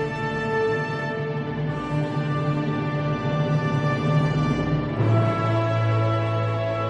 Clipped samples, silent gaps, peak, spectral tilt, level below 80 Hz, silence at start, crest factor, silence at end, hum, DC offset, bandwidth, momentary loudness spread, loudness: under 0.1%; none; -10 dBFS; -8 dB/octave; -46 dBFS; 0 s; 12 dB; 0 s; none; under 0.1%; 8.2 kHz; 5 LU; -24 LUFS